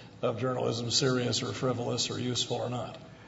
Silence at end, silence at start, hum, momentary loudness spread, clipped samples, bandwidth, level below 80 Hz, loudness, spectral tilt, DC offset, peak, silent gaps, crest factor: 0 s; 0 s; none; 8 LU; under 0.1%; 8 kHz; -64 dBFS; -30 LUFS; -4 dB/octave; under 0.1%; -12 dBFS; none; 18 dB